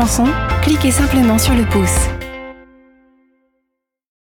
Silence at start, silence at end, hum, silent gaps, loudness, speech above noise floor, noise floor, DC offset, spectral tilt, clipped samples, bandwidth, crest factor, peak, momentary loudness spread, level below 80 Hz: 0 s; 1.7 s; none; none; -14 LUFS; 61 dB; -74 dBFS; under 0.1%; -5 dB/octave; under 0.1%; 18.5 kHz; 12 dB; -4 dBFS; 16 LU; -24 dBFS